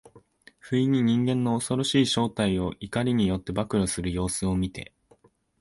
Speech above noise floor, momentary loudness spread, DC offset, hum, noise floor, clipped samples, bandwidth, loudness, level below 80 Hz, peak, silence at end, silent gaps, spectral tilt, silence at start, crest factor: 36 dB; 7 LU; under 0.1%; none; -61 dBFS; under 0.1%; 11.5 kHz; -26 LUFS; -46 dBFS; -10 dBFS; 0.75 s; none; -5.5 dB/octave; 0.15 s; 16 dB